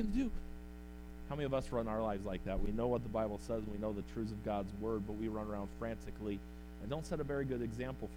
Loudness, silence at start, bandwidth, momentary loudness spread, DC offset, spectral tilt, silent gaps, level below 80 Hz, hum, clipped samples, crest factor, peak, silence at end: -41 LUFS; 0 s; 16.5 kHz; 12 LU; under 0.1%; -7.5 dB/octave; none; -48 dBFS; none; under 0.1%; 16 dB; -24 dBFS; 0 s